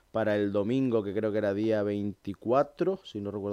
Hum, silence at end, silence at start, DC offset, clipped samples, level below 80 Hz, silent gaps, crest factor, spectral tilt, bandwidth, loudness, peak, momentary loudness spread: none; 0 s; 0.15 s; under 0.1%; under 0.1%; -68 dBFS; none; 16 dB; -8 dB/octave; 9.8 kHz; -29 LUFS; -12 dBFS; 8 LU